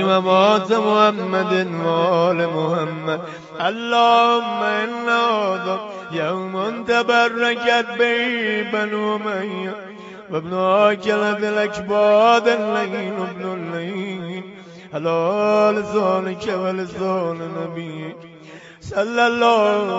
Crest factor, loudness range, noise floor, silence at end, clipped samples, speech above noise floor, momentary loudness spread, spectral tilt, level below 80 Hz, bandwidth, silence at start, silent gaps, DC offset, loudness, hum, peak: 18 dB; 4 LU; -41 dBFS; 0 s; under 0.1%; 22 dB; 13 LU; -5.5 dB/octave; -62 dBFS; 8 kHz; 0 s; none; under 0.1%; -19 LUFS; none; -2 dBFS